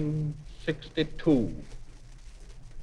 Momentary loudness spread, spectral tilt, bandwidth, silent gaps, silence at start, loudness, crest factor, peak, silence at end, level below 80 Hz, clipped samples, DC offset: 26 LU; -7.5 dB/octave; 10 kHz; none; 0 s; -30 LUFS; 18 dB; -14 dBFS; 0 s; -44 dBFS; under 0.1%; under 0.1%